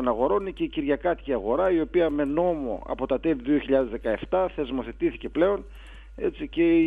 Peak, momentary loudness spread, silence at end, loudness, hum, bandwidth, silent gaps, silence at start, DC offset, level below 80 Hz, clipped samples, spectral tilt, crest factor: -10 dBFS; 8 LU; 0 s; -26 LUFS; none; 3.9 kHz; none; 0 s; under 0.1%; -44 dBFS; under 0.1%; -8.5 dB/octave; 16 dB